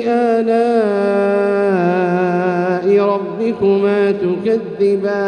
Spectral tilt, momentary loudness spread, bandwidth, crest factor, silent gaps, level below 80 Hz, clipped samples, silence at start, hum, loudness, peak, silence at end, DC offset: -8 dB/octave; 4 LU; 9.4 kHz; 12 dB; none; -60 dBFS; under 0.1%; 0 s; none; -15 LUFS; -4 dBFS; 0 s; under 0.1%